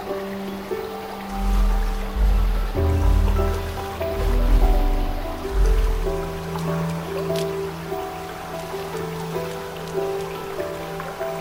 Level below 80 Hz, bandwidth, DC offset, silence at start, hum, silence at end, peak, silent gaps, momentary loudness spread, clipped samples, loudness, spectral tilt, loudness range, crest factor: -24 dBFS; 16.5 kHz; under 0.1%; 0 s; none; 0 s; -6 dBFS; none; 9 LU; under 0.1%; -25 LUFS; -6.5 dB/octave; 6 LU; 16 dB